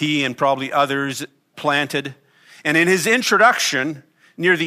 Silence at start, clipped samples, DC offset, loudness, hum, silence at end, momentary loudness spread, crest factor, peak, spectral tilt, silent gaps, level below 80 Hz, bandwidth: 0 s; under 0.1%; under 0.1%; -18 LUFS; none; 0 s; 13 LU; 18 dB; -2 dBFS; -3.5 dB/octave; none; -70 dBFS; 15.5 kHz